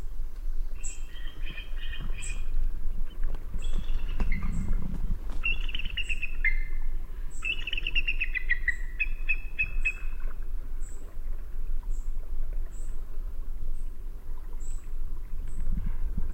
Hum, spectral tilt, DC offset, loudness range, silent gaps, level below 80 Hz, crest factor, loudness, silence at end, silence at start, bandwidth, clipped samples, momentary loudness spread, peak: none; -3.5 dB/octave; under 0.1%; 10 LU; none; -28 dBFS; 12 dB; -35 LUFS; 0 s; 0 s; 8.6 kHz; under 0.1%; 13 LU; -12 dBFS